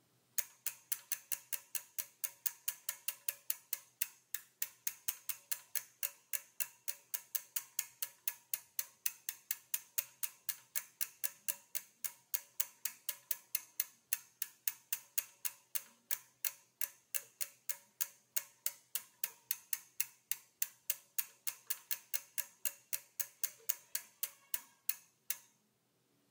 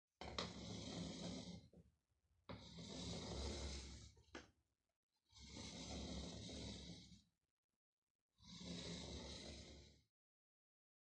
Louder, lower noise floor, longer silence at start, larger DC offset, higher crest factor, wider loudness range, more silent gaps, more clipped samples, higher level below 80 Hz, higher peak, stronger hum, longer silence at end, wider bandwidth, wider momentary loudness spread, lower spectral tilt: first, -40 LUFS vs -53 LUFS; second, -77 dBFS vs -85 dBFS; first, 0.35 s vs 0.2 s; neither; about the same, 30 dB vs 26 dB; second, 1 LU vs 4 LU; second, none vs 4.96-5.09 s, 7.51-7.69 s, 7.76-8.29 s; neither; second, under -90 dBFS vs -64 dBFS; first, -12 dBFS vs -30 dBFS; neither; second, 0.9 s vs 1.1 s; first, 19 kHz vs 10.5 kHz; second, 5 LU vs 12 LU; second, 3 dB/octave vs -4 dB/octave